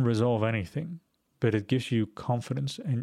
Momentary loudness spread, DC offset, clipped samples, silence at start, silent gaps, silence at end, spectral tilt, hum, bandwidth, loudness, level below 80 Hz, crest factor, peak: 10 LU; under 0.1%; under 0.1%; 0 s; none; 0 s; -7 dB/octave; none; 12 kHz; -29 LUFS; -62 dBFS; 16 dB; -12 dBFS